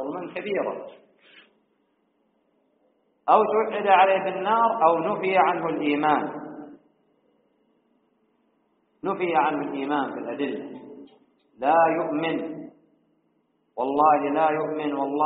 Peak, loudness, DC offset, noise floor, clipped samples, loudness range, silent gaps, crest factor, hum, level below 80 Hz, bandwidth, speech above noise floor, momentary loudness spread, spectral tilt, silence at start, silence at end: -4 dBFS; -23 LUFS; under 0.1%; -69 dBFS; under 0.1%; 9 LU; none; 20 dB; none; -74 dBFS; 4.5 kHz; 47 dB; 17 LU; -3.5 dB/octave; 0 s; 0 s